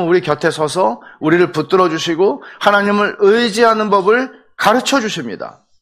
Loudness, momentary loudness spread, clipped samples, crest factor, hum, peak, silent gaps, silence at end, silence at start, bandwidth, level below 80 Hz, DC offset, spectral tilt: -14 LUFS; 9 LU; under 0.1%; 14 dB; none; 0 dBFS; none; 0.3 s; 0 s; 15.5 kHz; -58 dBFS; under 0.1%; -4.5 dB/octave